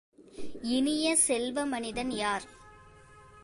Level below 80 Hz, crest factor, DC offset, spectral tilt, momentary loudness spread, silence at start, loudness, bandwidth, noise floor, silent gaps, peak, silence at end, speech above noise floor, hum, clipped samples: -58 dBFS; 20 dB; under 0.1%; -2 dB/octave; 20 LU; 0.2 s; -29 LUFS; 12 kHz; -54 dBFS; none; -12 dBFS; 0 s; 25 dB; none; under 0.1%